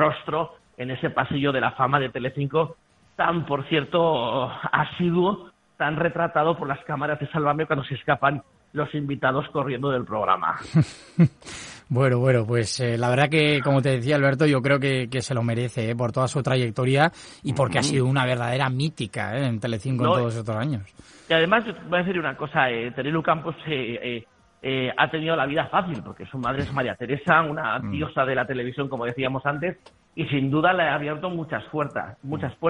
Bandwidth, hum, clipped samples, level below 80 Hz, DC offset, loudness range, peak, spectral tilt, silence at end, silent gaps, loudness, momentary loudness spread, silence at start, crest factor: 10.5 kHz; none; under 0.1%; -56 dBFS; under 0.1%; 4 LU; -2 dBFS; -6 dB/octave; 0 s; none; -24 LUFS; 9 LU; 0 s; 22 dB